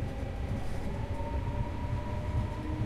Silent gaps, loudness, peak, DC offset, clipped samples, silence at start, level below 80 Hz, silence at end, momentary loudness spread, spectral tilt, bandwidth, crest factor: none; -36 LUFS; -20 dBFS; under 0.1%; under 0.1%; 0 s; -38 dBFS; 0 s; 3 LU; -7.5 dB/octave; 13 kHz; 12 dB